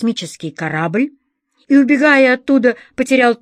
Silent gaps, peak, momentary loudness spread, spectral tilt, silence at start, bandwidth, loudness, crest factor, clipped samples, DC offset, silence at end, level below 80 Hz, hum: none; -2 dBFS; 13 LU; -5.5 dB/octave; 0 s; 10.5 kHz; -14 LUFS; 14 dB; under 0.1%; under 0.1%; 0.05 s; -60 dBFS; none